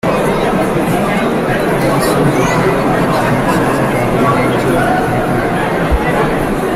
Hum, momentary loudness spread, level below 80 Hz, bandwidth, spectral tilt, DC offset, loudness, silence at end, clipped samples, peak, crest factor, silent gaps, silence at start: none; 2 LU; -28 dBFS; 16 kHz; -6 dB/octave; under 0.1%; -13 LUFS; 0 s; under 0.1%; -2 dBFS; 10 dB; none; 0.05 s